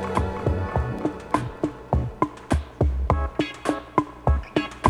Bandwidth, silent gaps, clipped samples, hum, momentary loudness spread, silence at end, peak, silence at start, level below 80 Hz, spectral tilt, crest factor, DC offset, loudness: 11.5 kHz; none; under 0.1%; none; 4 LU; 0 s; -2 dBFS; 0 s; -30 dBFS; -7 dB/octave; 24 dB; under 0.1%; -26 LUFS